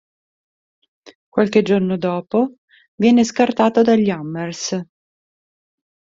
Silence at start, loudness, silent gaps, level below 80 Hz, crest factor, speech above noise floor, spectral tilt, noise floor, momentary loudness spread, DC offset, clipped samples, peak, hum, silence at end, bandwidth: 1.35 s; -18 LUFS; 2.58-2.68 s, 2.88-2.98 s; -60 dBFS; 18 dB; over 74 dB; -5.5 dB/octave; under -90 dBFS; 10 LU; under 0.1%; under 0.1%; -2 dBFS; none; 1.3 s; 7.8 kHz